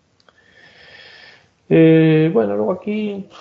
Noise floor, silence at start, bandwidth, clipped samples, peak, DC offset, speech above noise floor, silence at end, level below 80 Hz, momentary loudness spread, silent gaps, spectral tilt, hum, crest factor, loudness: -55 dBFS; 1.7 s; 5.6 kHz; under 0.1%; -2 dBFS; under 0.1%; 40 dB; 0.2 s; -60 dBFS; 12 LU; none; -10 dB/octave; none; 16 dB; -15 LUFS